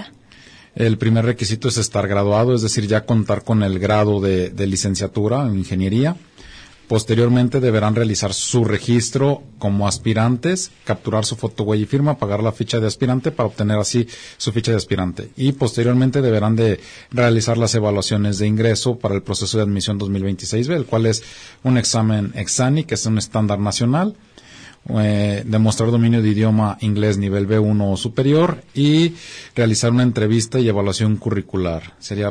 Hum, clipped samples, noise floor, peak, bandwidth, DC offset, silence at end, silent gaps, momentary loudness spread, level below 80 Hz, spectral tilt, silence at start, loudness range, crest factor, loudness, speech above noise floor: none; under 0.1%; -45 dBFS; -6 dBFS; 10.5 kHz; under 0.1%; 0 s; none; 6 LU; -48 dBFS; -5.5 dB/octave; 0 s; 2 LU; 12 dB; -18 LUFS; 28 dB